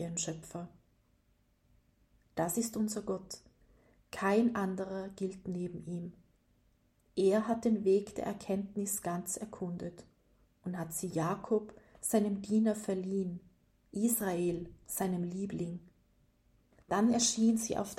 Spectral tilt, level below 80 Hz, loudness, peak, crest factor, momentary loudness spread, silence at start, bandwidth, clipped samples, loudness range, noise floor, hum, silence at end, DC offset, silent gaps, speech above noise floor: -5 dB/octave; -66 dBFS; -34 LUFS; -18 dBFS; 18 dB; 14 LU; 0 s; 16 kHz; under 0.1%; 5 LU; -72 dBFS; none; 0 s; under 0.1%; none; 38 dB